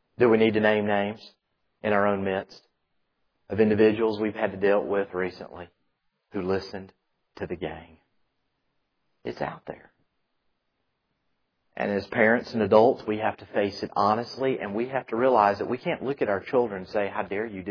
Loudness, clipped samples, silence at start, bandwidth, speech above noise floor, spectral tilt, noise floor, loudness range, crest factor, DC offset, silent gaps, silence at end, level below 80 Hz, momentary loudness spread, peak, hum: -25 LUFS; under 0.1%; 0.2 s; 5.4 kHz; 52 dB; -7.5 dB/octave; -77 dBFS; 14 LU; 22 dB; under 0.1%; none; 0 s; -64 dBFS; 18 LU; -6 dBFS; none